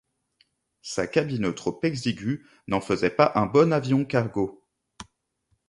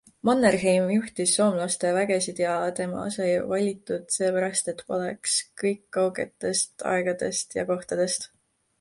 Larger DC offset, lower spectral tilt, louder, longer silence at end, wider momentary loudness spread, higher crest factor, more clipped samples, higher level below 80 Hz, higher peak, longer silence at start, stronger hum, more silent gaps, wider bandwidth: neither; first, -6.5 dB/octave vs -3.5 dB/octave; about the same, -25 LUFS vs -25 LUFS; about the same, 0.65 s vs 0.55 s; first, 11 LU vs 8 LU; about the same, 22 dB vs 18 dB; neither; first, -56 dBFS vs -64 dBFS; first, -4 dBFS vs -8 dBFS; first, 0.85 s vs 0.25 s; neither; neither; about the same, 11.5 kHz vs 11.5 kHz